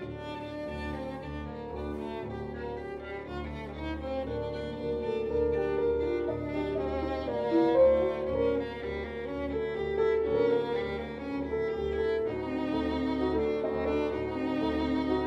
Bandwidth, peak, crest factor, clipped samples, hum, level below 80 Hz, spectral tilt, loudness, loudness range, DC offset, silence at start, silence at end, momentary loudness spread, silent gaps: 7.6 kHz; -14 dBFS; 16 dB; under 0.1%; none; -46 dBFS; -8 dB/octave; -31 LUFS; 9 LU; under 0.1%; 0 s; 0 s; 11 LU; none